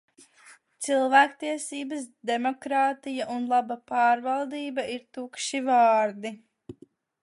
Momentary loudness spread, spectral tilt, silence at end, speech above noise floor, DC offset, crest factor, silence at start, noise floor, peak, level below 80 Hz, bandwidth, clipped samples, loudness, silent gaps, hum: 15 LU; -2.5 dB/octave; 0.5 s; 31 dB; under 0.1%; 20 dB; 0.45 s; -57 dBFS; -6 dBFS; -76 dBFS; 11.5 kHz; under 0.1%; -26 LUFS; none; none